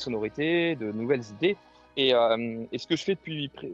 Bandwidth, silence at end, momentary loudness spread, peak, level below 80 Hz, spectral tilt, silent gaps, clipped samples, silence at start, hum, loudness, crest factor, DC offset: 7.8 kHz; 0 s; 11 LU; -10 dBFS; -64 dBFS; -5.5 dB/octave; none; under 0.1%; 0 s; none; -27 LUFS; 18 dB; under 0.1%